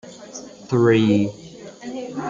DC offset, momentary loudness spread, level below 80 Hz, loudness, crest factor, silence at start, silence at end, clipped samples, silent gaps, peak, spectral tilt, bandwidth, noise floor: under 0.1%; 21 LU; -60 dBFS; -19 LUFS; 18 dB; 0.05 s; 0 s; under 0.1%; none; -4 dBFS; -6.5 dB/octave; 7.6 kHz; -39 dBFS